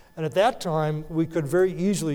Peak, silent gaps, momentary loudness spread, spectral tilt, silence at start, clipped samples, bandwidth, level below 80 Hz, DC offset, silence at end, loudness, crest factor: -8 dBFS; none; 5 LU; -6 dB/octave; 0.15 s; under 0.1%; 17.5 kHz; -50 dBFS; under 0.1%; 0 s; -24 LUFS; 16 dB